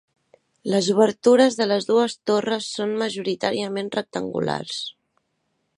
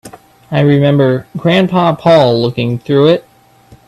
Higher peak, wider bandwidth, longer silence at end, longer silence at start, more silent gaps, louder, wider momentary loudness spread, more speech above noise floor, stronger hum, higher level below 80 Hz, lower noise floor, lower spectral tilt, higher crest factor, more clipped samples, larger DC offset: second, -4 dBFS vs 0 dBFS; about the same, 11.5 kHz vs 12.5 kHz; first, 0.85 s vs 0.65 s; first, 0.65 s vs 0.05 s; neither; second, -22 LUFS vs -11 LUFS; first, 11 LU vs 7 LU; first, 51 dB vs 33 dB; neither; second, -68 dBFS vs -48 dBFS; first, -73 dBFS vs -43 dBFS; second, -4.5 dB/octave vs -8 dB/octave; first, 20 dB vs 12 dB; neither; neither